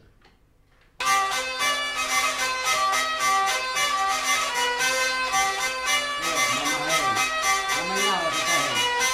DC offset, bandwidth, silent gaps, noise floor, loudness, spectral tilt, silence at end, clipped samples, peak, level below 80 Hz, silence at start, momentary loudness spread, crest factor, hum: under 0.1%; 16 kHz; none; -59 dBFS; -22 LUFS; 0 dB/octave; 0 s; under 0.1%; -10 dBFS; -56 dBFS; 1 s; 2 LU; 16 dB; none